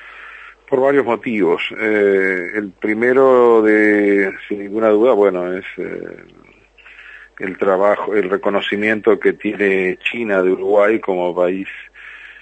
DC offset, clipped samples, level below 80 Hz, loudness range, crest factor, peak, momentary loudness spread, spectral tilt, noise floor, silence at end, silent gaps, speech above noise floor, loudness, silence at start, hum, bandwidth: under 0.1%; under 0.1%; -60 dBFS; 6 LU; 14 dB; -2 dBFS; 15 LU; -7 dB/octave; -45 dBFS; 0.1 s; none; 29 dB; -16 LUFS; 0 s; none; 8.4 kHz